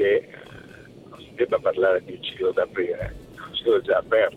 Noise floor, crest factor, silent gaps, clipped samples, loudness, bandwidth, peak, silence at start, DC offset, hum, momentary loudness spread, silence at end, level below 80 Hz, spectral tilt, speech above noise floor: -45 dBFS; 18 dB; none; under 0.1%; -24 LUFS; 10 kHz; -6 dBFS; 0 s; under 0.1%; none; 22 LU; 0 s; -50 dBFS; -6 dB/octave; 22 dB